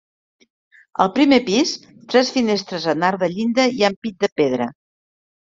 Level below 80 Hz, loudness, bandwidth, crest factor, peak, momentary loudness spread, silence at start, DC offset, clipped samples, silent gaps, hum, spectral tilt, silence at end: -60 dBFS; -19 LUFS; 7.8 kHz; 18 dB; -2 dBFS; 8 LU; 1 s; under 0.1%; under 0.1%; 3.96-4.02 s, 4.32-4.36 s; none; -4.5 dB/octave; 0.9 s